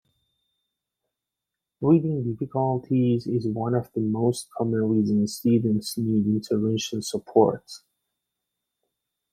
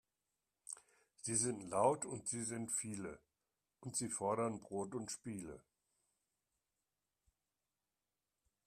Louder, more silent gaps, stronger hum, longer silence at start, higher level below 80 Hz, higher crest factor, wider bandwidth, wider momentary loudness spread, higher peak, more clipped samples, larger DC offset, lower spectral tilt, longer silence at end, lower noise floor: first, -24 LUFS vs -41 LUFS; neither; neither; first, 1.8 s vs 0.7 s; first, -64 dBFS vs -78 dBFS; about the same, 20 dB vs 24 dB; about the same, 15 kHz vs 14.5 kHz; second, 7 LU vs 17 LU; first, -4 dBFS vs -20 dBFS; neither; neither; first, -7 dB/octave vs -4 dB/octave; second, 1.55 s vs 3.05 s; second, -86 dBFS vs under -90 dBFS